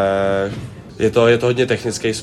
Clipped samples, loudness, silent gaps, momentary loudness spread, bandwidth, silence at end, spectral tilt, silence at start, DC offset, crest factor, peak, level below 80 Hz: under 0.1%; -17 LUFS; none; 12 LU; 13.5 kHz; 0 s; -5 dB/octave; 0 s; under 0.1%; 16 dB; -2 dBFS; -46 dBFS